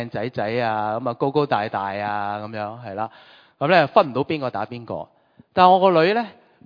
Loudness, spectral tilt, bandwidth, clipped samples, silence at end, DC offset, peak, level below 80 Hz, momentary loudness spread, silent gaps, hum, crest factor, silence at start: -21 LUFS; -8 dB/octave; 5.2 kHz; under 0.1%; 0.35 s; under 0.1%; 0 dBFS; -64 dBFS; 15 LU; none; none; 20 dB; 0 s